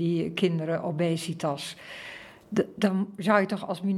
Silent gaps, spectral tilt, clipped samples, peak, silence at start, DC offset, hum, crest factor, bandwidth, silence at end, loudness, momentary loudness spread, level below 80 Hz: none; -6 dB/octave; under 0.1%; -6 dBFS; 0 s; under 0.1%; none; 22 dB; 14 kHz; 0 s; -28 LUFS; 16 LU; -70 dBFS